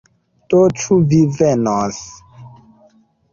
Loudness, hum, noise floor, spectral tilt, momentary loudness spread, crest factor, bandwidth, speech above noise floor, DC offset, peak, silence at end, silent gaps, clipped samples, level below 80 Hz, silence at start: -15 LUFS; none; -53 dBFS; -7 dB/octave; 12 LU; 14 dB; 7.4 kHz; 39 dB; under 0.1%; -2 dBFS; 0.85 s; none; under 0.1%; -50 dBFS; 0.5 s